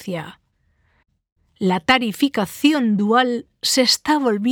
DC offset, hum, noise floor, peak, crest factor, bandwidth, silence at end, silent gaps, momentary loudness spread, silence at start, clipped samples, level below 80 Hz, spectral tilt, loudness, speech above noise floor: under 0.1%; none; -64 dBFS; -2 dBFS; 18 dB; over 20 kHz; 0 s; 1.32-1.36 s; 8 LU; 0 s; under 0.1%; -58 dBFS; -3.5 dB/octave; -18 LUFS; 45 dB